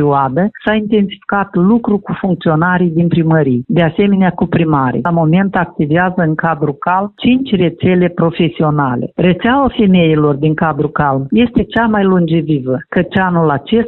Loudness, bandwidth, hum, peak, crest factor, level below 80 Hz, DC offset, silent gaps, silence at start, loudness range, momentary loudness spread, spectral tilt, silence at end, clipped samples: -13 LUFS; 4.2 kHz; none; 0 dBFS; 12 dB; -40 dBFS; under 0.1%; none; 0 s; 1 LU; 4 LU; -10.5 dB/octave; 0 s; under 0.1%